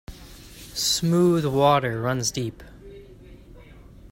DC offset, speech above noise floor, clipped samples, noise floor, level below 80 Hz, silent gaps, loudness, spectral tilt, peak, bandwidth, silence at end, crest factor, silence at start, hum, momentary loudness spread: under 0.1%; 24 dB; under 0.1%; -46 dBFS; -48 dBFS; none; -22 LUFS; -4.5 dB/octave; -4 dBFS; 16.5 kHz; 0.05 s; 20 dB; 0.1 s; none; 24 LU